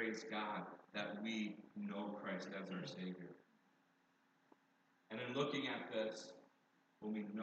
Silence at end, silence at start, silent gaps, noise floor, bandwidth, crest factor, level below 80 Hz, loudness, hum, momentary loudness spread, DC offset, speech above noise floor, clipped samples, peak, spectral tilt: 0 s; 0 s; none; -77 dBFS; 8.2 kHz; 20 dB; under -90 dBFS; -46 LUFS; none; 12 LU; under 0.1%; 31 dB; under 0.1%; -28 dBFS; -5 dB/octave